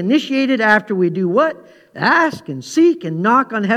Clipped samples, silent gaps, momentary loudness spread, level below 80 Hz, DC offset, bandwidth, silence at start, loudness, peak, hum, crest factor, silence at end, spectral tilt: under 0.1%; none; 6 LU; -66 dBFS; under 0.1%; 12.5 kHz; 0 s; -15 LUFS; 0 dBFS; none; 16 dB; 0 s; -5.5 dB/octave